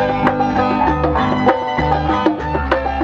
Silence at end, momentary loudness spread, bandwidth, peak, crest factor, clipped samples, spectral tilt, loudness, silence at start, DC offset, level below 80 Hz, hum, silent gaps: 0 s; 3 LU; 7.6 kHz; 0 dBFS; 16 dB; under 0.1%; -7.5 dB/octave; -16 LUFS; 0 s; under 0.1%; -28 dBFS; none; none